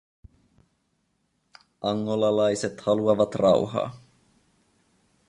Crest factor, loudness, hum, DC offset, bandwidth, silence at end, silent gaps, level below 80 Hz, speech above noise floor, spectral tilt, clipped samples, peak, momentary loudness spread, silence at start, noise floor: 20 dB; -24 LUFS; none; under 0.1%; 11.5 kHz; 1.3 s; none; -60 dBFS; 49 dB; -6 dB/octave; under 0.1%; -8 dBFS; 9 LU; 1.85 s; -72 dBFS